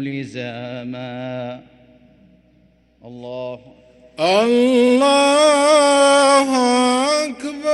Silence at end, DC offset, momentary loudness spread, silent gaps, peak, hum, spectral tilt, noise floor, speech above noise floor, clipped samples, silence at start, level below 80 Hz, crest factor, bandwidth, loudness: 0 s; under 0.1%; 17 LU; none; -2 dBFS; none; -3 dB/octave; -55 dBFS; 39 dB; under 0.1%; 0 s; -62 dBFS; 16 dB; 12 kHz; -14 LUFS